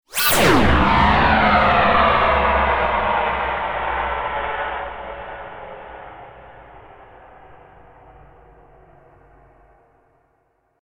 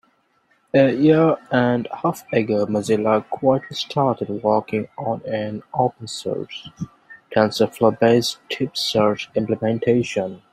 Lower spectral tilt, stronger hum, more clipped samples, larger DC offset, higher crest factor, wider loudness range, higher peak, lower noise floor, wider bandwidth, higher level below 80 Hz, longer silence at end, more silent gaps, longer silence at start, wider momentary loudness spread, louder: second, -4.5 dB/octave vs -6 dB/octave; neither; neither; neither; about the same, 18 dB vs 18 dB; first, 22 LU vs 5 LU; about the same, -2 dBFS vs -2 dBFS; about the same, -65 dBFS vs -63 dBFS; about the same, 16 kHz vs 15 kHz; first, -32 dBFS vs -60 dBFS; first, 3.25 s vs 0.15 s; neither; second, 0.1 s vs 0.75 s; first, 21 LU vs 10 LU; first, -17 LUFS vs -20 LUFS